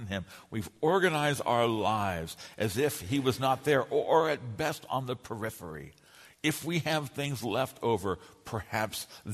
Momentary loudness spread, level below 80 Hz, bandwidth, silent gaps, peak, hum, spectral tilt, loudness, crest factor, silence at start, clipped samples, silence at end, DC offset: 13 LU; -60 dBFS; 13.5 kHz; none; -10 dBFS; none; -5 dB/octave; -31 LUFS; 20 dB; 0 s; under 0.1%; 0 s; under 0.1%